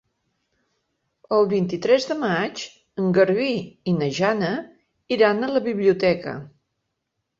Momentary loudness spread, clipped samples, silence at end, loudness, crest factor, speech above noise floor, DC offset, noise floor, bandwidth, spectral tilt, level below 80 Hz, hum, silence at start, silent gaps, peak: 10 LU; under 0.1%; 0.95 s; -22 LUFS; 18 dB; 57 dB; under 0.1%; -78 dBFS; 7.6 kHz; -6 dB/octave; -62 dBFS; none; 1.3 s; none; -4 dBFS